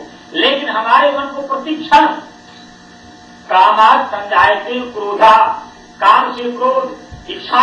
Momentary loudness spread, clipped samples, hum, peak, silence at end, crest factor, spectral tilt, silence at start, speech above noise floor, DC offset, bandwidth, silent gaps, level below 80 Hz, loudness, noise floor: 14 LU; under 0.1%; none; 0 dBFS; 0 s; 14 dB; -3.5 dB/octave; 0 s; 27 dB; under 0.1%; 9.6 kHz; none; -50 dBFS; -12 LUFS; -39 dBFS